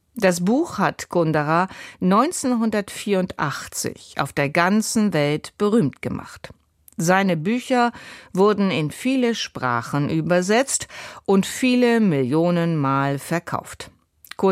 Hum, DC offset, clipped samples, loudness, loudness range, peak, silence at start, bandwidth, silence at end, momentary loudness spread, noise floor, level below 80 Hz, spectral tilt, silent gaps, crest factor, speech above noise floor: none; under 0.1%; under 0.1%; -21 LUFS; 2 LU; -4 dBFS; 0.15 s; 16 kHz; 0 s; 11 LU; -40 dBFS; -58 dBFS; -5 dB/octave; none; 18 dB; 19 dB